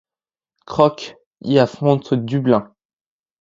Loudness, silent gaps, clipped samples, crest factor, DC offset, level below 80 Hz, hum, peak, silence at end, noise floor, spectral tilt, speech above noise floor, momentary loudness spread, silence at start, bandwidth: -18 LUFS; 1.26-1.31 s; under 0.1%; 20 dB; under 0.1%; -56 dBFS; none; 0 dBFS; 0.75 s; under -90 dBFS; -7.5 dB/octave; over 73 dB; 15 LU; 0.7 s; 7.6 kHz